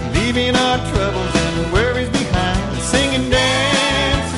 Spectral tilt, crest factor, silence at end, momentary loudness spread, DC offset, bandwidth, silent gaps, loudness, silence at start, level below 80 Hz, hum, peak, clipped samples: -4 dB/octave; 16 dB; 0 s; 4 LU; 0.2%; 11.5 kHz; none; -16 LUFS; 0 s; -28 dBFS; none; -2 dBFS; under 0.1%